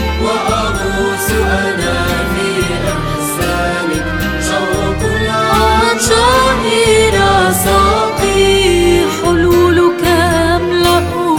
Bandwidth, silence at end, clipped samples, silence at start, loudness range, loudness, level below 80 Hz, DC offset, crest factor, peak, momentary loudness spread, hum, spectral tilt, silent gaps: over 20 kHz; 0 s; under 0.1%; 0 s; 5 LU; -12 LUFS; -24 dBFS; under 0.1%; 12 dB; 0 dBFS; 6 LU; none; -4.5 dB/octave; none